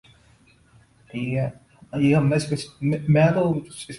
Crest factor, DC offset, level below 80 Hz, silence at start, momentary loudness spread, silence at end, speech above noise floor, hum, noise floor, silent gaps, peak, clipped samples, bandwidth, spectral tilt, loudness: 18 dB; under 0.1%; -54 dBFS; 1.15 s; 13 LU; 0 s; 35 dB; none; -56 dBFS; none; -6 dBFS; under 0.1%; 11.5 kHz; -7 dB/octave; -22 LUFS